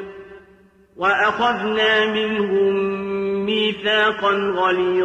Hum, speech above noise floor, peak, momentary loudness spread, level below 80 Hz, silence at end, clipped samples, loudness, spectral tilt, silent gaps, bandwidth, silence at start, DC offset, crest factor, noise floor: none; 33 dB; -6 dBFS; 6 LU; -56 dBFS; 0 s; under 0.1%; -19 LUFS; -5 dB/octave; none; 8.2 kHz; 0 s; under 0.1%; 12 dB; -52 dBFS